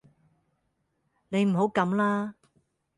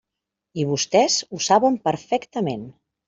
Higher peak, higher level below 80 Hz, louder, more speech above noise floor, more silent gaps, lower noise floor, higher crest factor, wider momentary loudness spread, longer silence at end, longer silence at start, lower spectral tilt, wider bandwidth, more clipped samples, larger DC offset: second, -10 dBFS vs -4 dBFS; second, -72 dBFS vs -64 dBFS; second, -26 LUFS vs -21 LUFS; second, 50 dB vs 63 dB; neither; second, -76 dBFS vs -84 dBFS; about the same, 20 dB vs 18 dB; second, 7 LU vs 10 LU; first, 0.65 s vs 0.35 s; first, 1.3 s vs 0.55 s; first, -7.5 dB/octave vs -4 dB/octave; first, 11 kHz vs 8 kHz; neither; neither